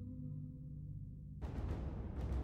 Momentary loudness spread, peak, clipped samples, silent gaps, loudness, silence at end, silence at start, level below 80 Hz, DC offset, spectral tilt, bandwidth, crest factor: 6 LU; -30 dBFS; under 0.1%; none; -47 LUFS; 0 s; 0 s; -48 dBFS; under 0.1%; -9 dB/octave; 6.8 kHz; 14 dB